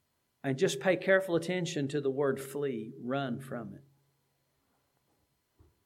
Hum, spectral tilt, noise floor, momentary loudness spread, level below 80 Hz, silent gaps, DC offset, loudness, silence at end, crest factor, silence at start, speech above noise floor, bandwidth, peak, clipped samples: none; -5.5 dB/octave; -76 dBFS; 12 LU; -78 dBFS; none; under 0.1%; -32 LUFS; 2.05 s; 22 dB; 0.45 s; 44 dB; 16 kHz; -12 dBFS; under 0.1%